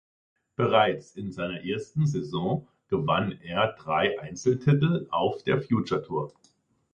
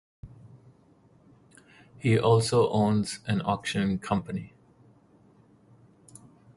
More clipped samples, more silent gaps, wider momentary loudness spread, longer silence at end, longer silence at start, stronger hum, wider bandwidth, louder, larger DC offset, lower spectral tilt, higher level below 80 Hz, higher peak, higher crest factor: neither; neither; second, 10 LU vs 15 LU; first, 0.65 s vs 0.4 s; first, 0.6 s vs 0.25 s; neither; second, 8.4 kHz vs 11.5 kHz; about the same, -27 LUFS vs -26 LUFS; neither; about the same, -6.5 dB/octave vs -6 dB/octave; about the same, -58 dBFS vs -56 dBFS; first, -6 dBFS vs -10 dBFS; about the same, 20 dB vs 20 dB